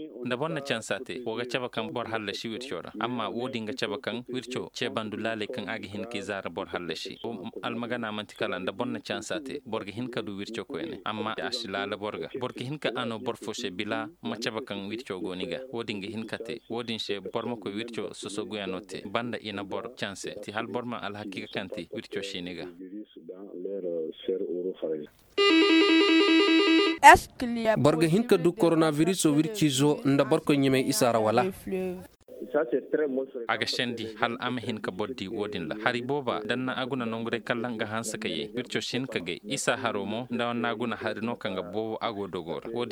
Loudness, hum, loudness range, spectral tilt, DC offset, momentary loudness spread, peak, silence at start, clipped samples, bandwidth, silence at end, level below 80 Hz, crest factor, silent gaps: -28 LUFS; none; 13 LU; -4.5 dB/octave; under 0.1%; 13 LU; -2 dBFS; 0 s; under 0.1%; 19.5 kHz; 0 s; -60 dBFS; 26 dB; none